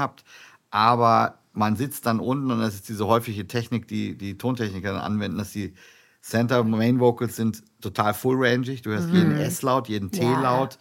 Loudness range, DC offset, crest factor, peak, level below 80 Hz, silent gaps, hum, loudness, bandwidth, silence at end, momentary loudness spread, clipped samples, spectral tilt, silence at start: 5 LU; under 0.1%; 20 dB; -4 dBFS; -64 dBFS; none; none; -24 LUFS; 17 kHz; 0.05 s; 10 LU; under 0.1%; -6 dB/octave; 0 s